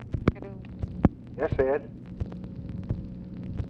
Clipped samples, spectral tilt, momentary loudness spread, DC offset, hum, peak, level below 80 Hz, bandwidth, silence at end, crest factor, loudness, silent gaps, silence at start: under 0.1%; -10 dB/octave; 13 LU; under 0.1%; none; -8 dBFS; -40 dBFS; 7 kHz; 0 s; 22 dB; -31 LUFS; none; 0 s